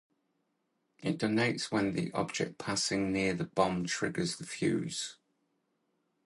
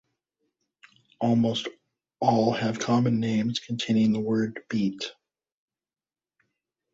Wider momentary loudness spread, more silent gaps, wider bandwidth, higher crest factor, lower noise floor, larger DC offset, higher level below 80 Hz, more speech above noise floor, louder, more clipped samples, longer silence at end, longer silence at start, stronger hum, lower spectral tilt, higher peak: about the same, 6 LU vs 7 LU; neither; first, 11.5 kHz vs 7.8 kHz; about the same, 22 dB vs 20 dB; second, -79 dBFS vs under -90 dBFS; neither; about the same, -64 dBFS vs -64 dBFS; second, 47 dB vs over 65 dB; second, -33 LUFS vs -26 LUFS; neither; second, 1.15 s vs 1.85 s; second, 1 s vs 1.2 s; neither; second, -4.5 dB/octave vs -6 dB/octave; second, -12 dBFS vs -8 dBFS